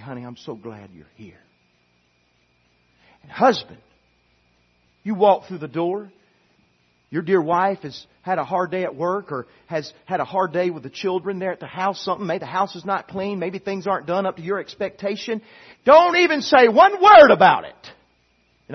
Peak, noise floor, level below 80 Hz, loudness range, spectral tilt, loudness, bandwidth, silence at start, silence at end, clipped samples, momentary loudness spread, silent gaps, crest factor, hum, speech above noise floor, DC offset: 0 dBFS; -63 dBFS; -62 dBFS; 13 LU; -5.5 dB/octave; -19 LUFS; 6.4 kHz; 0 s; 0 s; under 0.1%; 19 LU; none; 20 dB; 60 Hz at -60 dBFS; 44 dB; under 0.1%